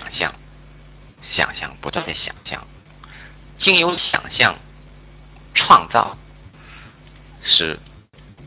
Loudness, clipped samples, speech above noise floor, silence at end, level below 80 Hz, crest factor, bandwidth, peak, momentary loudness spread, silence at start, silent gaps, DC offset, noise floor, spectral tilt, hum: -17 LUFS; under 0.1%; 27 dB; 0 s; -46 dBFS; 22 dB; 4 kHz; 0 dBFS; 19 LU; 0 s; none; under 0.1%; -45 dBFS; -0.5 dB/octave; none